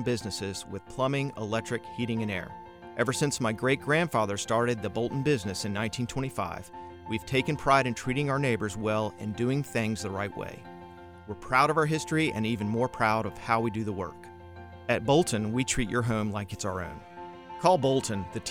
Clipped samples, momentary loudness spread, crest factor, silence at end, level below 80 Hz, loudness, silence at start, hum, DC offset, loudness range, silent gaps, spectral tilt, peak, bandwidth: under 0.1%; 17 LU; 22 dB; 0 s; -54 dBFS; -29 LUFS; 0 s; none; 0.1%; 3 LU; none; -5 dB/octave; -8 dBFS; 19 kHz